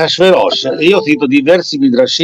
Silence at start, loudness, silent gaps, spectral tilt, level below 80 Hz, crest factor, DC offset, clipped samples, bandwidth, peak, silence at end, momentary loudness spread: 0 s; -10 LUFS; none; -4.5 dB/octave; -56 dBFS; 10 dB; under 0.1%; under 0.1%; 11 kHz; 0 dBFS; 0 s; 3 LU